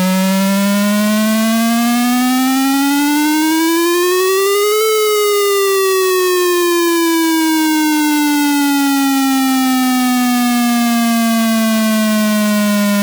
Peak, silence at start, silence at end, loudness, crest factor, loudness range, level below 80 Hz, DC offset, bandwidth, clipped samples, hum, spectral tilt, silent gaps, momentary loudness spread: -2 dBFS; 0 s; 0 s; -13 LUFS; 10 dB; 1 LU; -66 dBFS; under 0.1%; over 20 kHz; under 0.1%; none; -4 dB/octave; none; 1 LU